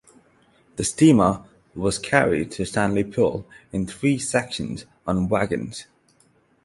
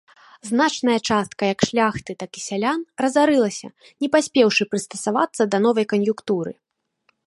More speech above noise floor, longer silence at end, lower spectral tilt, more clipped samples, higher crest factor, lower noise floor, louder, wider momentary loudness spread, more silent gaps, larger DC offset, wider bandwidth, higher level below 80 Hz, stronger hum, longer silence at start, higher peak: second, 39 dB vs 47 dB; about the same, 0.8 s vs 0.75 s; about the same, -5.5 dB/octave vs -4.5 dB/octave; neither; about the same, 22 dB vs 18 dB; second, -61 dBFS vs -67 dBFS; about the same, -22 LUFS vs -21 LUFS; first, 16 LU vs 11 LU; neither; neither; about the same, 11.5 kHz vs 11.5 kHz; first, -48 dBFS vs -58 dBFS; neither; first, 0.75 s vs 0.45 s; about the same, -2 dBFS vs -2 dBFS